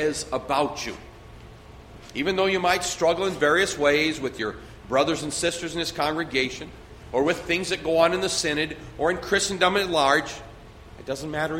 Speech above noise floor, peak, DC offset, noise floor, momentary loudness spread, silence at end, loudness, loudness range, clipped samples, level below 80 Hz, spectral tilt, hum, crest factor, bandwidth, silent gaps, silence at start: 21 dB; -4 dBFS; under 0.1%; -45 dBFS; 12 LU; 0 s; -24 LUFS; 3 LU; under 0.1%; -48 dBFS; -3 dB/octave; none; 20 dB; 16.5 kHz; none; 0 s